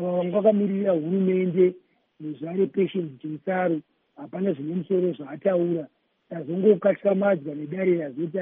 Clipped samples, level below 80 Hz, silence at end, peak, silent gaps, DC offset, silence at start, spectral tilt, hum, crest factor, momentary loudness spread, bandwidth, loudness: under 0.1%; -78 dBFS; 0 s; -6 dBFS; none; under 0.1%; 0 s; -8 dB/octave; none; 18 dB; 13 LU; 3.7 kHz; -24 LUFS